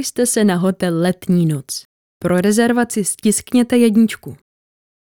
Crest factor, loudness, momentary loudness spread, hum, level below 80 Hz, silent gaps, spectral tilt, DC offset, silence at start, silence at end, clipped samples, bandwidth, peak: 16 dB; -16 LUFS; 12 LU; none; -54 dBFS; 1.85-2.20 s; -5 dB/octave; 0.1%; 0 s; 0.8 s; under 0.1%; 18 kHz; -2 dBFS